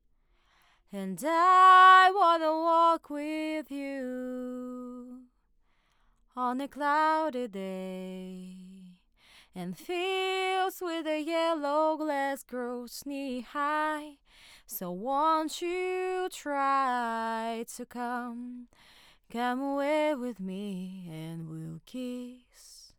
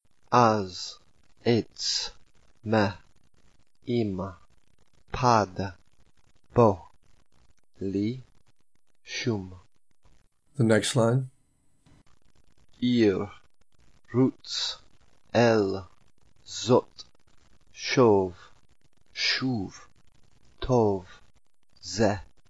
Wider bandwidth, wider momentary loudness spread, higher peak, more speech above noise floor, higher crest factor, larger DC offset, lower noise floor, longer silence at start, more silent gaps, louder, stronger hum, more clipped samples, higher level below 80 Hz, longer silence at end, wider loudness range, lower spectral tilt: first, 19.5 kHz vs 11 kHz; about the same, 18 LU vs 17 LU; about the same, -8 dBFS vs -6 dBFS; second, 40 dB vs 50 dB; about the same, 20 dB vs 22 dB; second, under 0.1% vs 0.2%; second, -69 dBFS vs -75 dBFS; first, 0.95 s vs 0.3 s; neither; about the same, -28 LUFS vs -26 LUFS; neither; neither; second, -70 dBFS vs -56 dBFS; about the same, 0.15 s vs 0.25 s; first, 13 LU vs 4 LU; second, -4 dB/octave vs -5.5 dB/octave